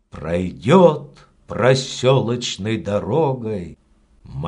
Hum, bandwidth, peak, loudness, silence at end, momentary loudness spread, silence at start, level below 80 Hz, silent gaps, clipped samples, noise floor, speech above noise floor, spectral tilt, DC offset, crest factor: none; 10.5 kHz; 0 dBFS; -18 LUFS; 0 s; 17 LU; 0.15 s; -48 dBFS; none; under 0.1%; -47 dBFS; 29 dB; -6 dB/octave; under 0.1%; 18 dB